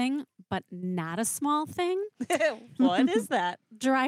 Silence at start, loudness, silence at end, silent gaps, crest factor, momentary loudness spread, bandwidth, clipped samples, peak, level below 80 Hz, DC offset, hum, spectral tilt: 0 s; -29 LUFS; 0 s; none; 16 dB; 9 LU; 16 kHz; under 0.1%; -12 dBFS; -76 dBFS; under 0.1%; none; -4 dB/octave